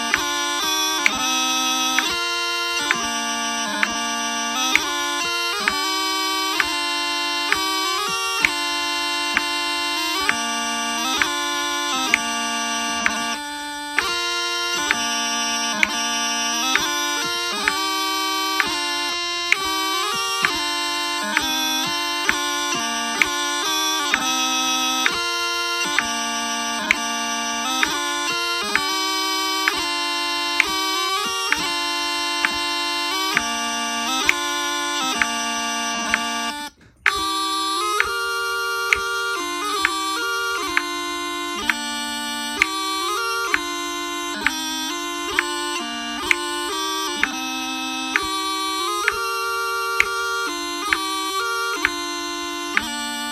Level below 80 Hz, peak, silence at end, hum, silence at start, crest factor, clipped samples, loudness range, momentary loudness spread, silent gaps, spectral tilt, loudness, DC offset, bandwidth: -54 dBFS; 0 dBFS; 0 s; none; 0 s; 22 dB; under 0.1%; 3 LU; 5 LU; none; 0 dB/octave; -21 LUFS; under 0.1%; 18 kHz